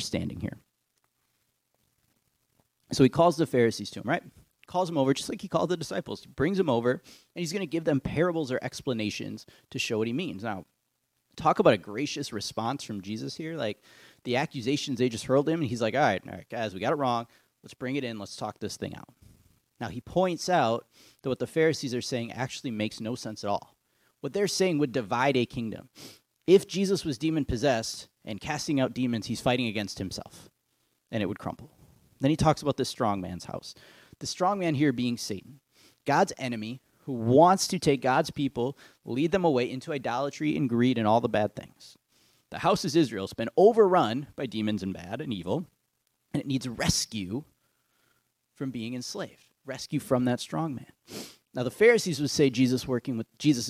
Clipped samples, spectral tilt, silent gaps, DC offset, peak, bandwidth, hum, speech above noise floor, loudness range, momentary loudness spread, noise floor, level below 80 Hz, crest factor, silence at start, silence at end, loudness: under 0.1%; -5 dB/octave; none; under 0.1%; -6 dBFS; 16 kHz; none; 49 dB; 7 LU; 15 LU; -77 dBFS; -58 dBFS; 22 dB; 0 s; 0 s; -28 LUFS